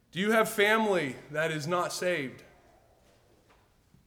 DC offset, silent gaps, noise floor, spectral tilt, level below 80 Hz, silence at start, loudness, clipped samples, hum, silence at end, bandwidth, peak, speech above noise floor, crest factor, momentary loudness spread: under 0.1%; none; -64 dBFS; -4 dB/octave; -70 dBFS; 0.15 s; -28 LUFS; under 0.1%; none; 1.65 s; over 20 kHz; -12 dBFS; 35 dB; 18 dB; 9 LU